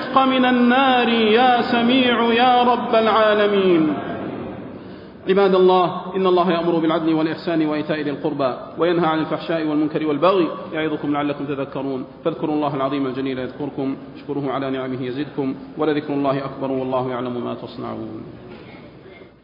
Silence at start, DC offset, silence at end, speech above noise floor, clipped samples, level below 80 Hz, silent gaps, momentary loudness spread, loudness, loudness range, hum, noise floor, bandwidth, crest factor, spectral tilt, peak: 0 s; under 0.1%; 0.15 s; 24 dB; under 0.1%; -58 dBFS; none; 14 LU; -19 LUFS; 9 LU; none; -42 dBFS; 5.4 kHz; 16 dB; -8.5 dB/octave; -4 dBFS